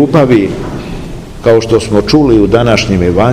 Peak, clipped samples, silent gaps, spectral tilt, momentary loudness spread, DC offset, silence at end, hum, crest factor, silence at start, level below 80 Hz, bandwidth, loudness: 0 dBFS; 3%; none; -6.5 dB/octave; 15 LU; 0.7%; 0 s; none; 8 dB; 0 s; -26 dBFS; 14.5 kHz; -9 LUFS